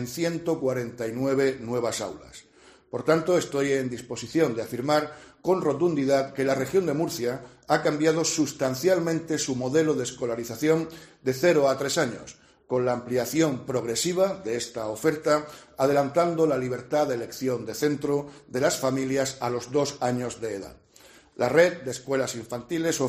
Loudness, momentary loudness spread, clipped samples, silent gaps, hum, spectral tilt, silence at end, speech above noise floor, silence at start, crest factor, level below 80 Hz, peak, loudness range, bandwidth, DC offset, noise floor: -26 LUFS; 9 LU; under 0.1%; none; none; -4.5 dB/octave; 0 s; 28 dB; 0 s; 22 dB; -62 dBFS; -4 dBFS; 2 LU; 15.5 kHz; under 0.1%; -54 dBFS